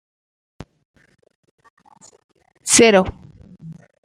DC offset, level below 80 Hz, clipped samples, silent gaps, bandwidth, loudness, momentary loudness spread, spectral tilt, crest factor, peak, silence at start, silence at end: under 0.1%; -50 dBFS; under 0.1%; none; 15 kHz; -14 LUFS; 29 LU; -2.5 dB/octave; 22 dB; 0 dBFS; 2.65 s; 0.3 s